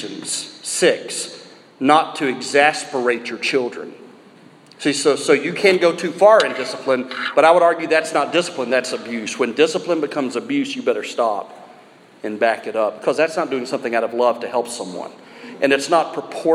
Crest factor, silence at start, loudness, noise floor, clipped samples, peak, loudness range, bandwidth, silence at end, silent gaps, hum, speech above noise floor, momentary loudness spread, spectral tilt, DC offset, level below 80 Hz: 18 dB; 0 s; -18 LUFS; -46 dBFS; under 0.1%; 0 dBFS; 6 LU; 14 kHz; 0 s; none; none; 28 dB; 12 LU; -3 dB/octave; under 0.1%; -74 dBFS